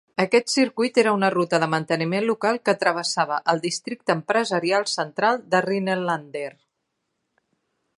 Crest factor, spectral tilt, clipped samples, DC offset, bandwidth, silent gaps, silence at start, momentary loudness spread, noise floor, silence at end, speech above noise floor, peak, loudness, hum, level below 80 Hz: 20 dB; -4 dB/octave; under 0.1%; under 0.1%; 11.5 kHz; none; 0.2 s; 7 LU; -77 dBFS; 1.5 s; 55 dB; -4 dBFS; -22 LUFS; none; -74 dBFS